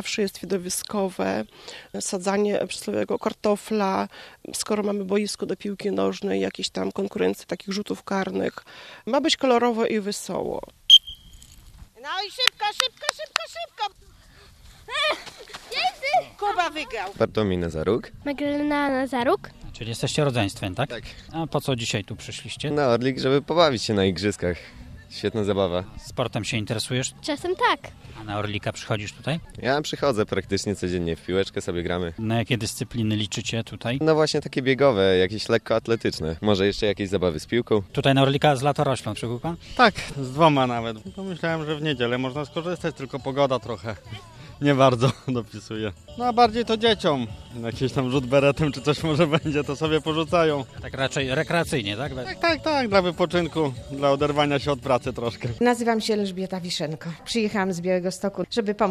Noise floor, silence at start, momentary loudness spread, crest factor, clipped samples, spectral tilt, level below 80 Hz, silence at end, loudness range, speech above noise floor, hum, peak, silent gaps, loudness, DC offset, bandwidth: -51 dBFS; 0 s; 11 LU; 24 dB; under 0.1%; -4.5 dB/octave; -50 dBFS; 0 s; 6 LU; 26 dB; none; 0 dBFS; none; -24 LUFS; under 0.1%; 14 kHz